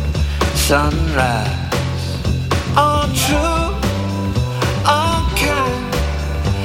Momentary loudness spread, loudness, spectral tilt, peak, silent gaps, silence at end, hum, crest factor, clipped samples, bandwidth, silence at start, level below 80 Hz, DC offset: 6 LU; -17 LUFS; -5 dB/octave; -2 dBFS; none; 0 s; none; 16 dB; under 0.1%; 17 kHz; 0 s; -24 dBFS; under 0.1%